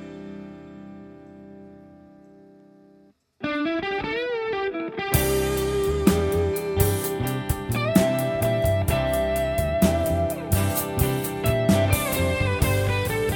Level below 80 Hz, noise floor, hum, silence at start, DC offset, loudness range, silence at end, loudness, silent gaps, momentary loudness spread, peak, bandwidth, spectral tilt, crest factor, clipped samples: -36 dBFS; -57 dBFS; none; 0 s; under 0.1%; 9 LU; 0 s; -23 LUFS; none; 17 LU; -2 dBFS; 18 kHz; -5.5 dB/octave; 22 dB; under 0.1%